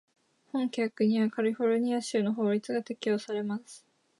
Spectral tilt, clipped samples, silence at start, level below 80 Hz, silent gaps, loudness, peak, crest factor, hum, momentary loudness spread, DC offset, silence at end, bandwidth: -6 dB/octave; under 0.1%; 0.55 s; -82 dBFS; none; -30 LUFS; -16 dBFS; 14 dB; none; 7 LU; under 0.1%; 0.4 s; 11.5 kHz